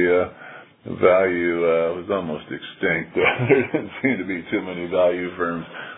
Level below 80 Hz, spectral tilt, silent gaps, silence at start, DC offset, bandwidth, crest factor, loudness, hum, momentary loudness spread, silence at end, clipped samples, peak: -58 dBFS; -10.5 dB/octave; none; 0 s; under 0.1%; 4 kHz; 20 dB; -21 LUFS; none; 13 LU; 0 s; under 0.1%; -2 dBFS